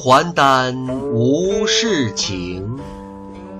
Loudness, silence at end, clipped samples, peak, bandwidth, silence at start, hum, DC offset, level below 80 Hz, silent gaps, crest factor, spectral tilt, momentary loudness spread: -17 LUFS; 0 s; under 0.1%; -2 dBFS; 14 kHz; 0 s; none; under 0.1%; -44 dBFS; none; 16 dB; -4 dB/octave; 19 LU